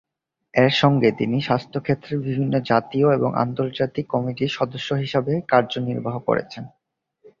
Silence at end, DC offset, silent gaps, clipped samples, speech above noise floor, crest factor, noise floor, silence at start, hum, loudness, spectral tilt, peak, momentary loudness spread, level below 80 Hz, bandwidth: 0.7 s; under 0.1%; none; under 0.1%; 49 dB; 20 dB; -70 dBFS; 0.55 s; none; -22 LUFS; -7 dB/octave; -2 dBFS; 8 LU; -58 dBFS; 7.4 kHz